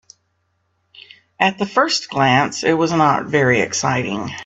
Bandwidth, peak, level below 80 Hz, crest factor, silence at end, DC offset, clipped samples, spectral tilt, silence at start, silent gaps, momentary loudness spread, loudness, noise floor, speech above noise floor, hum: 8.4 kHz; 0 dBFS; -58 dBFS; 18 dB; 0 s; under 0.1%; under 0.1%; -4 dB/octave; 0.95 s; none; 4 LU; -17 LUFS; -67 dBFS; 50 dB; none